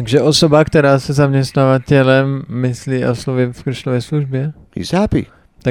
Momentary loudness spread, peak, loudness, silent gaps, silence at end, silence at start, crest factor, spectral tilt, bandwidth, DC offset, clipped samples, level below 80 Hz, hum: 11 LU; 0 dBFS; -15 LUFS; none; 0 s; 0 s; 14 dB; -6 dB/octave; 13 kHz; under 0.1%; under 0.1%; -40 dBFS; none